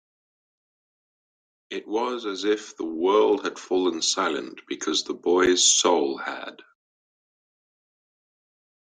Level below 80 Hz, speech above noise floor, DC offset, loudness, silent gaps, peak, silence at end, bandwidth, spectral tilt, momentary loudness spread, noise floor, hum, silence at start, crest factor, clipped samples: -64 dBFS; over 66 dB; under 0.1%; -23 LUFS; none; -6 dBFS; 2.35 s; 10 kHz; -1 dB/octave; 16 LU; under -90 dBFS; none; 1.7 s; 20 dB; under 0.1%